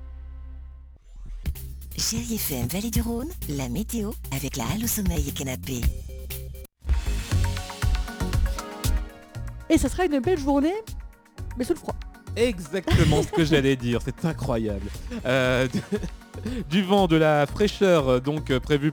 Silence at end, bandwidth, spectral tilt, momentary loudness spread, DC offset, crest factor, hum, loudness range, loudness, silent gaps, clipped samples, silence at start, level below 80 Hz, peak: 0 s; over 20 kHz; -5.5 dB/octave; 17 LU; under 0.1%; 18 dB; none; 6 LU; -25 LUFS; none; under 0.1%; 0 s; -32 dBFS; -6 dBFS